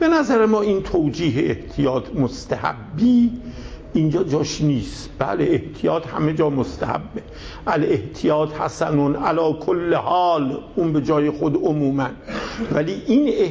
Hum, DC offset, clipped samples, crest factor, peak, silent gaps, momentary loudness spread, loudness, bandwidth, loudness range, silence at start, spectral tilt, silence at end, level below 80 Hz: none; under 0.1%; under 0.1%; 14 dB; -6 dBFS; none; 9 LU; -20 LUFS; 8 kHz; 2 LU; 0 s; -7 dB/octave; 0 s; -42 dBFS